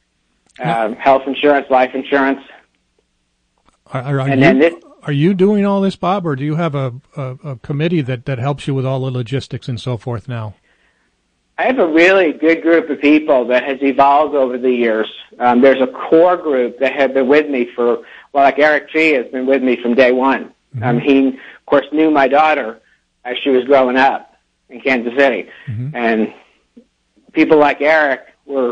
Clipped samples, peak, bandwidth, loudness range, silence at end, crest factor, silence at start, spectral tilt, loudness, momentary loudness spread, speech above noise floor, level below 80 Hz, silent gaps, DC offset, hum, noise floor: under 0.1%; 0 dBFS; 9.2 kHz; 7 LU; 0 s; 14 dB; 0.6 s; -7.5 dB/octave; -14 LUFS; 13 LU; 51 dB; -56 dBFS; none; under 0.1%; none; -65 dBFS